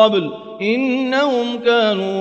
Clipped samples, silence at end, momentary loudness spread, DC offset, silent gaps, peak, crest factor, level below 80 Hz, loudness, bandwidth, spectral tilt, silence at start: under 0.1%; 0 s; 6 LU; under 0.1%; none; -2 dBFS; 16 dB; -66 dBFS; -17 LUFS; 8 kHz; -5.5 dB/octave; 0 s